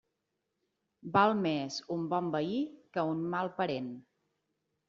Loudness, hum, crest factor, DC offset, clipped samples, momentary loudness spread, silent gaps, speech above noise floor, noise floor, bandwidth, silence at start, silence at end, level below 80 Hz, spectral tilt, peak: -33 LUFS; none; 22 dB; under 0.1%; under 0.1%; 11 LU; none; 52 dB; -84 dBFS; 7.6 kHz; 1.05 s; 0.9 s; -74 dBFS; -4.5 dB/octave; -12 dBFS